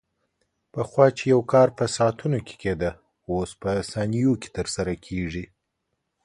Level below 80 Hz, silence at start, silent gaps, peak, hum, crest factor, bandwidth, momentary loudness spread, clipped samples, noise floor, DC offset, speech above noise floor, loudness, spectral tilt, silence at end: -48 dBFS; 0.75 s; none; -2 dBFS; none; 22 dB; 11.5 kHz; 11 LU; under 0.1%; -78 dBFS; under 0.1%; 55 dB; -24 LUFS; -6 dB/octave; 0.8 s